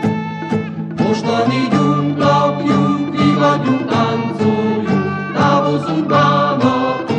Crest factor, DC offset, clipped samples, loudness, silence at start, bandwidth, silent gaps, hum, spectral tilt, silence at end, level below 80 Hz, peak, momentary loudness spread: 14 dB; under 0.1%; under 0.1%; -15 LUFS; 0 s; 9 kHz; none; none; -7 dB/octave; 0 s; -56 dBFS; 0 dBFS; 6 LU